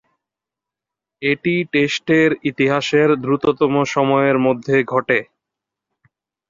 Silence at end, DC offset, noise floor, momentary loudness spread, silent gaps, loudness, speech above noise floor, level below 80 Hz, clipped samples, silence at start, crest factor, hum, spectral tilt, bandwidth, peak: 1.25 s; under 0.1%; -86 dBFS; 4 LU; none; -17 LUFS; 70 dB; -58 dBFS; under 0.1%; 1.2 s; 16 dB; none; -6 dB/octave; 7.6 kHz; -2 dBFS